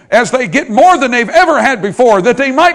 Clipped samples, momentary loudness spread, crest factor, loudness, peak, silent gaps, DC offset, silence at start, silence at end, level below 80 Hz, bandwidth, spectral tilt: 3%; 5 LU; 10 dB; -9 LUFS; 0 dBFS; none; under 0.1%; 0.1 s; 0 s; -46 dBFS; 12 kHz; -4 dB/octave